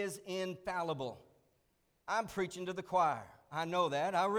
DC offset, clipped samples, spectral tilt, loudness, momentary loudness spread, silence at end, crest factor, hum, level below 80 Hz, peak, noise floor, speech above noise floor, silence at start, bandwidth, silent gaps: under 0.1%; under 0.1%; -4.5 dB/octave; -37 LUFS; 11 LU; 0 s; 18 dB; none; -72 dBFS; -20 dBFS; -77 dBFS; 41 dB; 0 s; 19.5 kHz; none